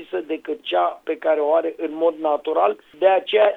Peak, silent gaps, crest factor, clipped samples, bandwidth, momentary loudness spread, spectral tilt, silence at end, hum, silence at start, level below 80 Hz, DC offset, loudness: -4 dBFS; none; 16 dB; under 0.1%; 4.1 kHz; 9 LU; -5 dB/octave; 0 s; none; 0 s; -70 dBFS; under 0.1%; -21 LUFS